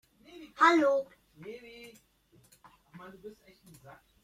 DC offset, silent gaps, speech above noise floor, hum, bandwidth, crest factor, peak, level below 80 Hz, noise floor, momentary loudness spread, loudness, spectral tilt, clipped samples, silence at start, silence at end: under 0.1%; none; 34 dB; none; 15 kHz; 22 dB; -10 dBFS; -74 dBFS; -65 dBFS; 28 LU; -26 LUFS; -4 dB/octave; under 0.1%; 0.4 s; 0.95 s